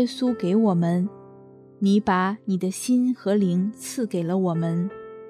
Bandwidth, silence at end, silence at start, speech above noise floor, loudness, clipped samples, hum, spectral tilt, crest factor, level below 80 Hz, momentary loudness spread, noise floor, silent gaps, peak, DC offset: 14 kHz; 0 s; 0 s; 25 dB; -23 LUFS; under 0.1%; none; -6.5 dB/octave; 14 dB; -66 dBFS; 7 LU; -48 dBFS; none; -8 dBFS; under 0.1%